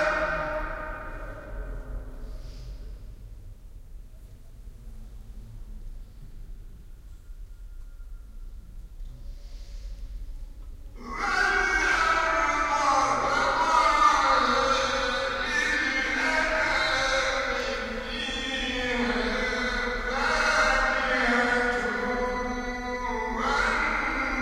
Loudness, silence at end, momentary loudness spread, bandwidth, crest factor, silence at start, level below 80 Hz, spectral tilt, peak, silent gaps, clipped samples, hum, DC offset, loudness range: -25 LUFS; 0 s; 24 LU; 15.5 kHz; 18 dB; 0 s; -40 dBFS; -3 dB/octave; -10 dBFS; none; under 0.1%; none; under 0.1%; 23 LU